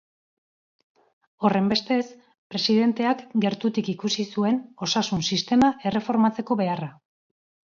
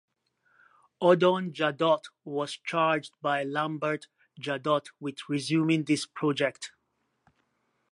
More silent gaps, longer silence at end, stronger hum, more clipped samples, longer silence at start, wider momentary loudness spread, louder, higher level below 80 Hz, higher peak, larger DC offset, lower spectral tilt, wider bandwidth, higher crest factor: first, 2.38-2.50 s vs none; second, 0.8 s vs 1.25 s; neither; neither; first, 1.4 s vs 1 s; second, 6 LU vs 12 LU; first, -24 LUFS vs -28 LUFS; first, -62 dBFS vs -82 dBFS; about the same, -6 dBFS vs -8 dBFS; neither; about the same, -5 dB/octave vs -5.5 dB/octave; second, 7.4 kHz vs 11.5 kHz; about the same, 18 dB vs 20 dB